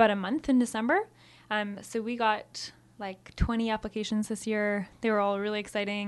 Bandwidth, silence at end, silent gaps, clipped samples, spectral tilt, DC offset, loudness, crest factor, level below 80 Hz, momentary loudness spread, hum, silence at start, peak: 12 kHz; 0 s; none; under 0.1%; -5 dB/octave; under 0.1%; -30 LUFS; 20 dB; -46 dBFS; 13 LU; none; 0 s; -10 dBFS